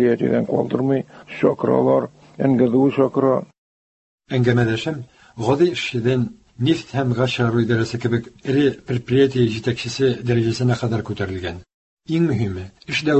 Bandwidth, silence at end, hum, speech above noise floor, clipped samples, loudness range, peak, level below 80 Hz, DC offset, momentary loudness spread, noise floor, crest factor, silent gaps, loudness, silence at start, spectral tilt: 8.4 kHz; 0 s; none; over 71 dB; under 0.1%; 3 LU; -4 dBFS; -48 dBFS; under 0.1%; 9 LU; under -90 dBFS; 16 dB; 3.58-4.18 s, 11.74-11.97 s; -20 LUFS; 0 s; -7 dB/octave